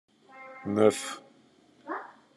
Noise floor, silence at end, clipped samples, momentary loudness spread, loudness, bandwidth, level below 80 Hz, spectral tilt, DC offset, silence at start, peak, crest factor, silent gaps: -61 dBFS; 0.3 s; under 0.1%; 24 LU; -29 LUFS; 12.5 kHz; -80 dBFS; -5 dB/octave; under 0.1%; 0.35 s; -8 dBFS; 24 dB; none